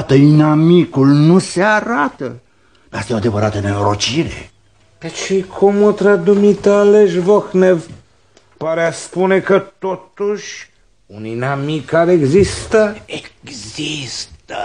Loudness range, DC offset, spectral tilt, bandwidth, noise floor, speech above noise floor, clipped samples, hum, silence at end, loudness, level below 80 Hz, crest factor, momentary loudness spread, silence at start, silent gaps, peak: 6 LU; 0.2%; -6 dB/octave; 10 kHz; -52 dBFS; 38 dB; under 0.1%; none; 0 s; -14 LUFS; -44 dBFS; 14 dB; 18 LU; 0 s; none; 0 dBFS